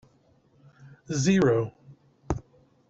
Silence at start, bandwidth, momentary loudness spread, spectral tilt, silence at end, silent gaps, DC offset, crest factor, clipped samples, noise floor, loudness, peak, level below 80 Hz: 0.85 s; 8 kHz; 13 LU; -6 dB/octave; 0.5 s; none; under 0.1%; 18 dB; under 0.1%; -63 dBFS; -26 LUFS; -10 dBFS; -50 dBFS